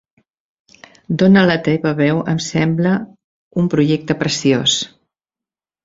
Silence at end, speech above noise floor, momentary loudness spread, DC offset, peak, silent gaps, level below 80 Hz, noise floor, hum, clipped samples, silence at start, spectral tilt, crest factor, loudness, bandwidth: 1 s; 74 dB; 10 LU; under 0.1%; -2 dBFS; 3.24-3.51 s; -52 dBFS; -89 dBFS; none; under 0.1%; 1.1 s; -5 dB/octave; 16 dB; -16 LUFS; 7.8 kHz